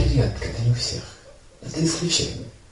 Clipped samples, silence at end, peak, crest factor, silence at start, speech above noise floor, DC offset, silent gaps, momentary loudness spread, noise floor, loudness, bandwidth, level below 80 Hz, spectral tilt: under 0.1%; 0.15 s; -8 dBFS; 16 dB; 0 s; 22 dB; under 0.1%; none; 15 LU; -45 dBFS; -24 LUFS; 11.5 kHz; -34 dBFS; -4.5 dB/octave